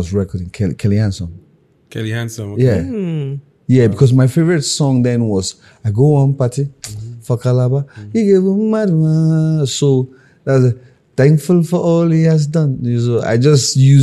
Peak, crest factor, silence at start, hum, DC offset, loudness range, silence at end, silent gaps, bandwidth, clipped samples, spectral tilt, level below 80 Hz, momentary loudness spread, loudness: 0 dBFS; 14 dB; 0 s; none; under 0.1%; 4 LU; 0 s; none; 12.5 kHz; under 0.1%; -6.5 dB/octave; -46 dBFS; 13 LU; -14 LUFS